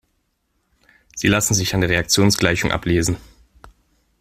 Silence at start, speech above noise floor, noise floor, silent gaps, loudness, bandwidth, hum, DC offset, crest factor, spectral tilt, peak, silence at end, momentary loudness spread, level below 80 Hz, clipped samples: 1.15 s; 51 dB; -69 dBFS; none; -18 LUFS; 16 kHz; none; under 0.1%; 20 dB; -4 dB/octave; 0 dBFS; 1 s; 8 LU; -40 dBFS; under 0.1%